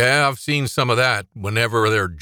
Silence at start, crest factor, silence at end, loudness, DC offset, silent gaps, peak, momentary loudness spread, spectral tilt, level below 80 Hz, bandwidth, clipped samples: 0 s; 16 dB; 0 s; -19 LUFS; under 0.1%; none; -4 dBFS; 5 LU; -4.5 dB/octave; -52 dBFS; 20 kHz; under 0.1%